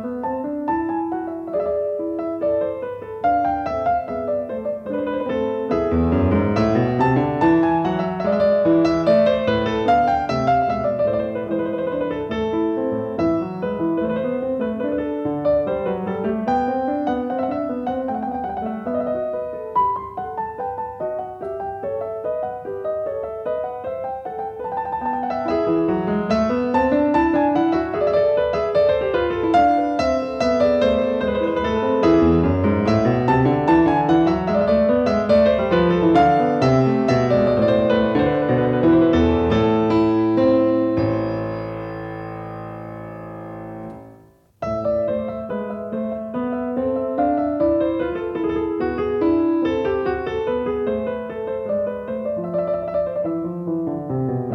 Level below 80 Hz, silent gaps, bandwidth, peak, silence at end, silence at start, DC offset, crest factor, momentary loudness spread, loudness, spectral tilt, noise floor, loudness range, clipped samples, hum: -44 dBFS; none; 6.8 kHz; -4 dBFS; 0 s; 0 s; under 0.1%; 16 dB; 11 LU; -20 LUFS; -8 dB/octave; -50 dBFS; 9 LU; under 0.1%; none